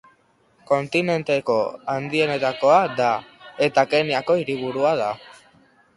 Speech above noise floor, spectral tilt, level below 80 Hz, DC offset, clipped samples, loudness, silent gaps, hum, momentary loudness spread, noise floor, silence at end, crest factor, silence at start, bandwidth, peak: 40 dB; -5.5 dB/octave; -64 dBFS; under 0.1%; under 0.1%; -21 LUFS; none; none; 9 LU; -60 dBFS; 0.65 s; 18 dB; 0.7 s; 11.5 kHz; -4 dBFS